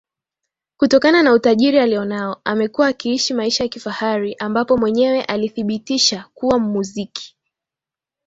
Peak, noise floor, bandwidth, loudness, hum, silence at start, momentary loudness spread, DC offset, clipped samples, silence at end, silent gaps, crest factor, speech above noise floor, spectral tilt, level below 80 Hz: -2 dBFS; -88 dBFS; 8 kHz; -17 LUFS; none; 0.8 s; 11 LU; under 0.1%; under 0.1%; 1 s; none; 16 dB; 71 dB; -4 dB/octave; -56 dBFS